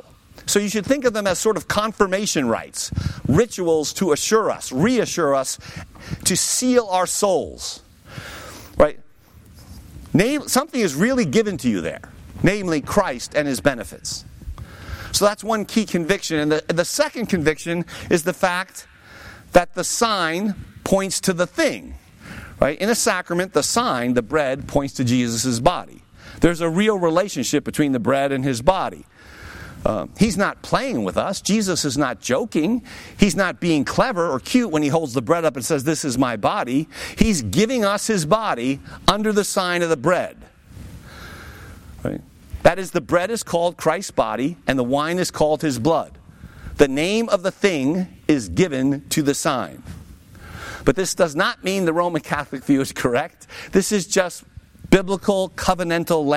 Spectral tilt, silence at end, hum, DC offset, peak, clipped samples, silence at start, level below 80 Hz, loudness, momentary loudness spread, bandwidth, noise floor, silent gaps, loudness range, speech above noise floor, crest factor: -4.5 dB/octave; 0 s; none; under 0.1%; -2 dBFS; under 0.1%; 0.35 s; -42 dBFS; -20 LUFS; 16 LU; 16.5 kHz; -47 dBFS; none; 3 LU; 27 dB; 18 dB